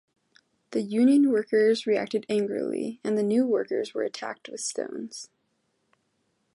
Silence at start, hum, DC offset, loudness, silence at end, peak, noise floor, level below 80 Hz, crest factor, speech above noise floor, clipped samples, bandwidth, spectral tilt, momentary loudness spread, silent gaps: 0.7 s; none; under 0.1%; -26 LUFS; 1.3 s; -12 dBFS; -74 dBFS; -78 dBFS; 16 dB; 49 dB; under 0.1%; 11.5 kHz; -5 dB/octave; 15 LU; none